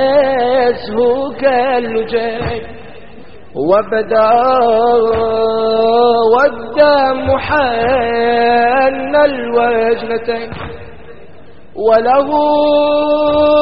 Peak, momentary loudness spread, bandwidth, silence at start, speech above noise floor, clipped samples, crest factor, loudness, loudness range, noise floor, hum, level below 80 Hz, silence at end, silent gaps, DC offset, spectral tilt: 0 dBFS; 10 LU; 5.4 kHz; 0 s; 28 dB; under 0.1%; 12 dB; -12 LUFS; 4 LU; -40 dBFS; none; -40 dBFS; 0 s; none; 2%; -3 dB/octave